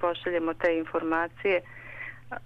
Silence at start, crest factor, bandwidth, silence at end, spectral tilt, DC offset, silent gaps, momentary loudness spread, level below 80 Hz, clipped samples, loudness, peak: 0 s; 16 dB; 6.4 kHz; 0 s; -6.5 dB/octave; under 0.1%; none; 13 LU; -60 dBFS; under 0.1%; -28 LUFS; -14 dBFS